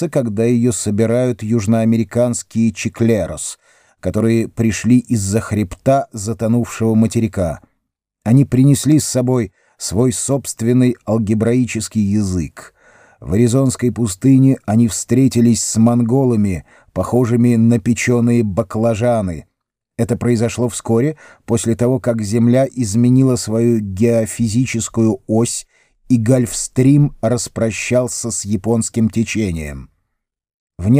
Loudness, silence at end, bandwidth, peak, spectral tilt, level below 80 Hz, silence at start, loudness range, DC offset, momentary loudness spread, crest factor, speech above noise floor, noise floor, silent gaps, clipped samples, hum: -16 LUFS; 0 s; 16 kHz; -2 dBFS; -6.5 dB/octave; -44 dBFS; 0 s; 3 LU; under 0.1%; 9 LU; 14 dB; 58 dB; -73 dBFS; 30.54-30.67 s; under 0.1%; none